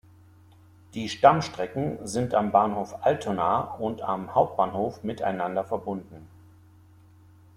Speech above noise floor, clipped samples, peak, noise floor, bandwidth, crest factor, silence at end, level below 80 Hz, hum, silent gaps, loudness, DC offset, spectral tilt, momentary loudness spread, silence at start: 28 dB; under 0.1%; -4 dBFS; -54 dBFS; 13.5 kHz; 24 dB; 1.3 s; -62 dBFS; none; none; -26 LUFS; under 0.1%; -6 dB/octave; 11 LU; 0.95 s